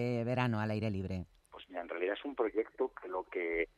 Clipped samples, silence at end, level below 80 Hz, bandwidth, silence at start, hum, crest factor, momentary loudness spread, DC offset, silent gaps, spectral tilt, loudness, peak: under 0.1%; 0.1 s; -64 dBFS; 12 kHz; 0 s; none; 18 dB; 11 LU; under 0.1%; none; -8 dB/octave; -37 LUFS; -18 dBFS